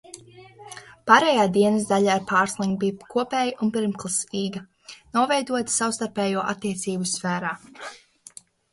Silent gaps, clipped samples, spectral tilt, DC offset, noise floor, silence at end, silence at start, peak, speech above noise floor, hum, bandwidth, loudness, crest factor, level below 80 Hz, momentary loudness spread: none; under 0.1%; -4 dB/octave; under 0.1%; -48 dBFS; 0.75 s; 0.15 s; 0 dBFS; 26 dB; none; 11.5 kHz; -23 LUFS; 24 dB; -64 dBFS; 21 LU